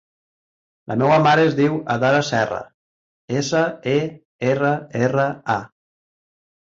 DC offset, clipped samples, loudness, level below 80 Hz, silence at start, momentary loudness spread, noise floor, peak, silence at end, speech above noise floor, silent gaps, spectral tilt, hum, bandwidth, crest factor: under 0.1%; under 0.1%; -19 LUFS; -58 dBFS; 0.9 s; 10 LU; under -90 dBFS; -4 dBFS; 1.1 s; over 71 dB; 2.74-3.28 s, 4.25-4.39 s; -6 dB/octave; none; 7.8 kHz; 16 dB